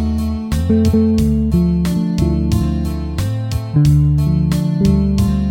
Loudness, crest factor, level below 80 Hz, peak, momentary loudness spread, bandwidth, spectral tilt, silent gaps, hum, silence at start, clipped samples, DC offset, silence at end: -16 LUFS; 12 dB; -22 dBFS; -2 dBFS; 7 LU; 16.5 kHz; -8 dB/octave; none; none; 0 s; under 0.1%; under 0.1%; 0 s